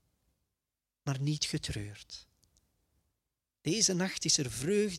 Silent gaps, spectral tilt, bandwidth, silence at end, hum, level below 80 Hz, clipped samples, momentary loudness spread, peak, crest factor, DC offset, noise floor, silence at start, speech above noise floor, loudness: none; -3.5 dB/octave; 15.5 kHz; 0 s; none; -60 dBFS; under 0.1%; 17 LU; -12 dBFS; 22 dB; under 0.1%; -90 dBFS; 1.05 s; 57 dB; -31 LUFS